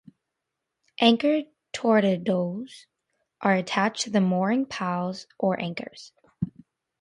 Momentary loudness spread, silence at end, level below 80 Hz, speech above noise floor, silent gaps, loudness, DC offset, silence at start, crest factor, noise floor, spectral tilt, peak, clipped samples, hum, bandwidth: 16 LU; 0.5 s; -64 dBFS; 59 dB; none; -25 LUFS; under 0.1%; 1 s; 22 dB; -84 dBFS; -5.5 dB/octave; -6 dBFS; under 0.1%; none; 11 kHz